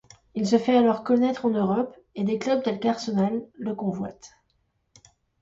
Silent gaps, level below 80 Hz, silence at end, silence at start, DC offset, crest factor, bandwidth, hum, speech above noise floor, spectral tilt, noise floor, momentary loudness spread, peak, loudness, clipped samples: none; -64 dBFS; 1.15 s; 0.35 s; under 0.1%; 18 dB; 7.8 kHz; none; 47 dB; -6.5 dB/octave; -71 dBFS; 12 LU; -8 dBFS; -25 LUFS; under 0.1%